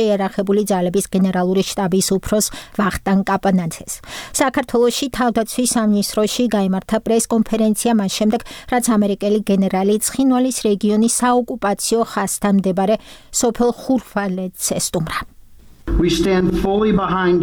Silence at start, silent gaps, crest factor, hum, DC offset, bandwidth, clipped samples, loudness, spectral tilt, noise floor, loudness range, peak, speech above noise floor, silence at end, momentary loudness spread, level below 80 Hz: 0 s; none; 14 dB; none; under 0.1%; 19.5 kHz; under 0.1%; -18 LUFS; -4.5 dB/octave; -42 dBFS; 2 LU; -4 dBFS; 25 dB; 0 s; 6 LU; -36 dBFS